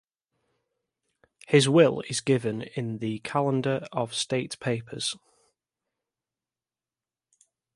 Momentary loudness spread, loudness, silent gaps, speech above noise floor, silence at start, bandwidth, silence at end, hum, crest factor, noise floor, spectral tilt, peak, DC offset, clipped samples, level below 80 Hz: 12 LU; -26 LUFS; none; over 64 dB; 1.5 s; 11.5 kHz; 2.6 s; none; 22 dB; under -90 dBFS; -5 dB/octave; -6 dBFS; under 0.1%; under 0.1%; -68 dBFS